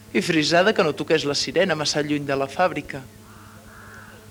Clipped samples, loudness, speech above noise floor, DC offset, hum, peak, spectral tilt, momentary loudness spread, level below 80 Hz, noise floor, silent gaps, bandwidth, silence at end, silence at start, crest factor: under 0.1%; -21 LUFS; 23 dB; under 0.1%; none; -4 dBFS; -4 dB/octave; 23 LU; -56 dBFS; -45 dBFS; none; over 20 kHz; 0.1 s; 0 s; 18 dB